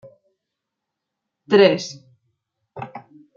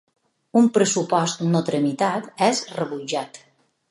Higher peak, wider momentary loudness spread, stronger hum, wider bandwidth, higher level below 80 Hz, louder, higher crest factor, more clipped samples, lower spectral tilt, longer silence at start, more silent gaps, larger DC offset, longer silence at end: about the same, -2 dBFS vs -4 dBFS; first, 22 LU vs 10 LU; neither; second, 7.4 kHz vs 11.5 kHz; about the same, -70 dBFS vs -72 dBFS; first, -16 LUFS vs -22 LUFS; about the same, 22 dB vs 18 dB; neither; about the same, -5 dB/octave vs -4.5 dB/octave; first, 1.5 s vs 0.55 s; neither; neither; second, 0.4 s vs 0.55 s